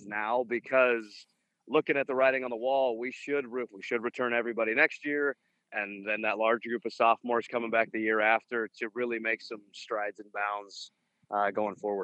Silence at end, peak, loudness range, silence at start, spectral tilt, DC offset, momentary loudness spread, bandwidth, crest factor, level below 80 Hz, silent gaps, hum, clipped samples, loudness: 0 s; -10 dBFS; 3 LU; 0 s; -5 dB/octave; under 0.1%; 11 LU; 8.6 kHz; 22 dB; -90 dBFS; none; none; under 0.1%; -30 LUFS